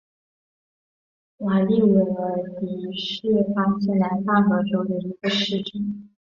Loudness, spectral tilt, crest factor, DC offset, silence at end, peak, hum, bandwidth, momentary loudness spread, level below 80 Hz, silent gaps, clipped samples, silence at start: -22 LUFS; -7 dB/octave; 16 dB; under 0.1%; 0.25 s; -6 dBFS; none; 7.2 kHz; 11 LU; -62 dBFS; none; under 0.1%; 1.4 s